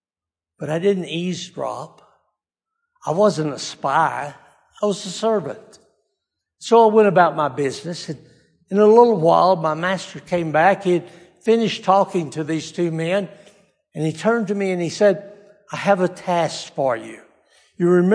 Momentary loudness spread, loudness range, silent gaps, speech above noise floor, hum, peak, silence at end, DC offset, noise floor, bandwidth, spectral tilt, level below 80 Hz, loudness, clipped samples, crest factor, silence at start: 16 LU; 7 LU; none; over 72 dB; none; 0 dBFS; 0 s; under 0.1%; under -90 dBFS; 10.5 kHz; -6 dB/octave; -68 dBFS; -19 LUFS; under 0.1%; 20 dB; 0.6 s